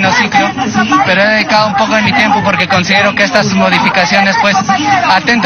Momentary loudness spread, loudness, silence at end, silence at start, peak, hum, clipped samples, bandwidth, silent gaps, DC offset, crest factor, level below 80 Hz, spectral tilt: 2 LU; -9 LUFS; 0 s; 0 s; 0 dBFS; none; 0.3%; 9.4 kHz; none; under 0.1%; 10 dB; -44 dBFS; -4 dB/octave